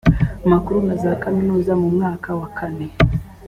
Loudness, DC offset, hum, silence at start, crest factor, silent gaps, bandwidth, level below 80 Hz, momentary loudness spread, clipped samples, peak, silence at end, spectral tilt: -19 LUFS; under 0.1%; none; 0.05 s; 16 dB; none; 9.8 kHz; -30 dBFS; 9 LU; under 0.1%; -2 dBFS; 0 s; -9 dB/octave